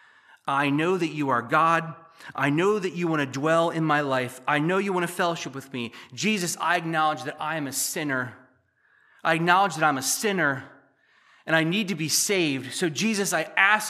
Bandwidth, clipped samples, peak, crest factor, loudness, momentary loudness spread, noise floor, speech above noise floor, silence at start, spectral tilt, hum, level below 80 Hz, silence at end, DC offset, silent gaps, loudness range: 15 kHz; under 0.1%; -4 dBFS; 22 dB; -24 LUFS; 12 LU; -64 dBFS; 39 dB; 0.45 s; -3.5 dB/octave; none; -80 dBFS; 0 s; under 0.1%; none; 3 LU